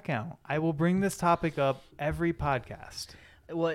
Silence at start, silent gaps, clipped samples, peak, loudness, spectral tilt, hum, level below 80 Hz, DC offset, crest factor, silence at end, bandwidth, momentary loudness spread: 0.05 s; none; under 0.1%; -14 dBFS; -30 LUFS; -6.5 dB/octave; none; -52 dBFS; under 0.1%; 16 dB; 0 s; 15 kHz; 14 LU